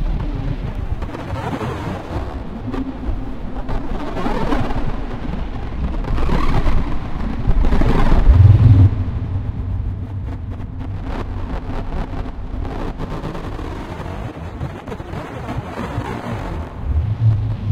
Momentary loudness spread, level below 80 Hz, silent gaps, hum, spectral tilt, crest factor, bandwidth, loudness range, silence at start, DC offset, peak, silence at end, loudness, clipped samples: 12 LU; -22 dBFS; none; none; -8.5 dB/octave; 18 dB; 7.4 kHz; 12 LU; 0 s; under 0.1%; 0 dBFS; 0 s; -21 LUFS; under 0.1%